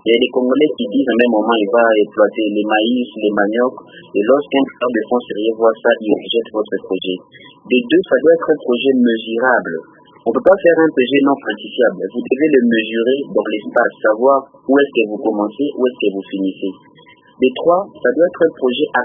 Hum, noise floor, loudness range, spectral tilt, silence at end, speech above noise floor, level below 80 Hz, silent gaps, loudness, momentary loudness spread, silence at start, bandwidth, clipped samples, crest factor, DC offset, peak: none; -46 dBFS; 3 LU; -8.5 dB/octave; 0 s; 31 dB; -64 dBFS; none; -15 LUFS; 8 LU; 0.05 s; 3.8 kHz; under 0.1%; 16 dB; under 0.1%; 0 dBFS